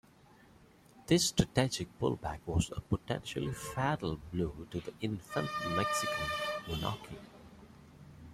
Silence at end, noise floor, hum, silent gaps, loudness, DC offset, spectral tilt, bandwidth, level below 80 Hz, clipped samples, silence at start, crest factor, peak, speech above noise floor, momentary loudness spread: 0 s; -61 dBFS; none; none; -35 LUFS; under 0.1%; -4.5 dB/octave; 16 kHz; -52 dBFS; under 0.1%; 0.95 s; 24 dB; -12 dBFS; 26 dB; 19 LU